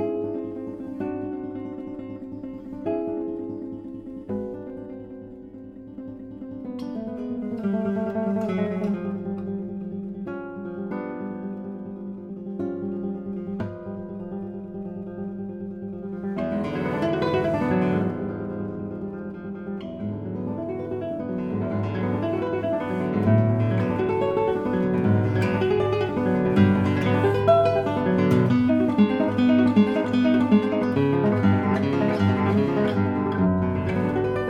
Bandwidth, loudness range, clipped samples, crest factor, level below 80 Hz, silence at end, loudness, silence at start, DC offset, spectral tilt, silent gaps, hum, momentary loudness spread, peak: 8.6 kHz; 12 LU; under 0.1%; 18 dB; -52 dBFS; 0 s; -25 LUFS; 0 s; under 0.1%; -9 dB/octave; none; none; 15 LU; -6 dBFS